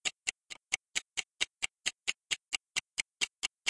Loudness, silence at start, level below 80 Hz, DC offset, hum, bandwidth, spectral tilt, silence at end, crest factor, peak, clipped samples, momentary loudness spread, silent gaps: -36 LUFS; 0.05 s; -74 dBFS; under 0.1%; none; 11.5 kHz; 2.5 dB/octave; 0 s; 26 dB; -12 dBFS; under 0.1%; 4 LU; none